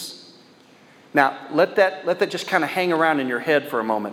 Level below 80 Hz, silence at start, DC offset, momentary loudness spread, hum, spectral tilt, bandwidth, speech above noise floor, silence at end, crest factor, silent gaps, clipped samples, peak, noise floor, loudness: -78 dBFS; 0 s; under 0.1%; 5 LU; none; -4.5 dB/octave; 16.5 kHz; 30 dB; 0 s; 20 dB; none; under 0.1%; -2 dBFS; -51 dBFS; -21 LUFS